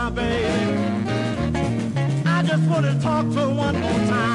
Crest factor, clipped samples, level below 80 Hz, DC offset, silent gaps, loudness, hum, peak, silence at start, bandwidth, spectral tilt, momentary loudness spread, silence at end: 12 dB; under 0.1%; -40 dBFS; under 0.1%; none; -21 LUFS; none; -8 dBFS; 0 s; 11.5 kHz; -7 dB/octave; 4 LU; 0 s